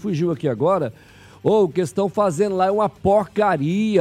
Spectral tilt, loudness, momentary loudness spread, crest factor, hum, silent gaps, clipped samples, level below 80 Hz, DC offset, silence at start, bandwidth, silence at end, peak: -7 dB/octave; -20 LUFS; 4 LU; 14 dB; none; none; under 0.1%; -52 dBFS; under 0.1%; 0 s; 13.5 kHz; 0 s; -6 dBFS